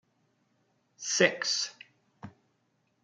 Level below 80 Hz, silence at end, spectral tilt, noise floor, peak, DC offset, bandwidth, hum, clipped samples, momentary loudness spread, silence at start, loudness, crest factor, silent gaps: -82 dBFS; 0.75 s; -1.5 dB/octave; -74 dBFS; -8 dBFS; under 0.1%; 11 kHz; none; under 0.1%; 12 LU; 1 s; -28 LUFS; 26 dB; none